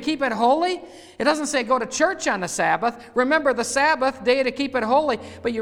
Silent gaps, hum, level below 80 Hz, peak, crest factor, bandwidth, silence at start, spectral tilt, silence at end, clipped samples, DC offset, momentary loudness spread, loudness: none; none; -56 dBFS; -6 dBFS; 16 dB; 15 kHz; 0 s; -3 dB/octave; 0 s; under 0.1%; under 0.1%; 5 LU; -21 LUFS